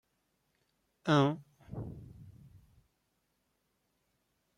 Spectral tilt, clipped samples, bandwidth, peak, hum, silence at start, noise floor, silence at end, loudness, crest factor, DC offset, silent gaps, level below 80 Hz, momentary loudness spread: -7 dB/octave; under 0.1%; 10.5 kHz; -14 dBFS; none; 1.05 s; -79 dBFS; 2.25 s; -32 LUFS; 24 dB; under 0.1%; none; -66 dBFS; 22 LU